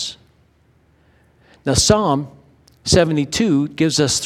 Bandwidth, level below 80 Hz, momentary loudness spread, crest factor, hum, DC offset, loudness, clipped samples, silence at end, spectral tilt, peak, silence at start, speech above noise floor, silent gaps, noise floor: 16 kHz; -40 dBFS; 14 LU; 20 dB; none; under 0.1%; -17 LUFS; under 0.1%; 0 s; -4 dB/octave; 0 dBFS; 0 s; 40 dB; none; -56 dBFS